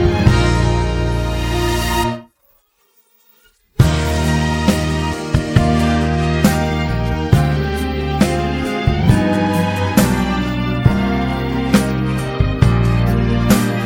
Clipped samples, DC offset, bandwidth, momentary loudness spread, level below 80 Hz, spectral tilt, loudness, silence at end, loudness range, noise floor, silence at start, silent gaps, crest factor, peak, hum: under 0.1%; under 0.1%; 17.5 kHz; 5 LU; -24 dBFS; -6 dB/octave; -16 LUFS; 0 s; 3 LU; -58 dBFS; 0 s; none; 16 dB; 0 dBFS; none